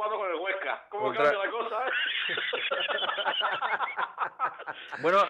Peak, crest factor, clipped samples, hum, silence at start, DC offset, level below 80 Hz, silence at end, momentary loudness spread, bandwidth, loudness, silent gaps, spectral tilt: -14 dBFS; 16 dB; under 0.1%; none; 0 s; under 0.1%; -78 dBFS; 0 s; 7 LU; 9.2 kHz; -29 LUFS; none; -3.5 dB/octave